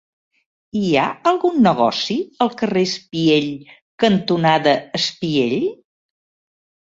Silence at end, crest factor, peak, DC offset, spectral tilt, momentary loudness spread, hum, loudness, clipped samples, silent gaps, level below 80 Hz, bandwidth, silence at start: 1.15 s; 18 dB; -2 dBFS; under 0.1%; -5.5 dB/octave; 8 LU; none; -18 LUFS; under 0.1%; 3.82-3.98 s; -60 dBFS; 7.8 kHz; 0.75 s